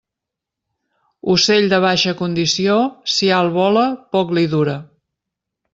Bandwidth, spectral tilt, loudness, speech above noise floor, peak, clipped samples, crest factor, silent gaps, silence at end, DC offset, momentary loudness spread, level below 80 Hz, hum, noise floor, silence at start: 7.8 kHz; -4.5 dB/octave; -16 LUFS; 68 dB; -2 dBFS; under 0.1%; 16 dB; none; 0.9 s; under 0.1%; 6 LU; -58 dBFS; none; -83 dBFS; 1.25 s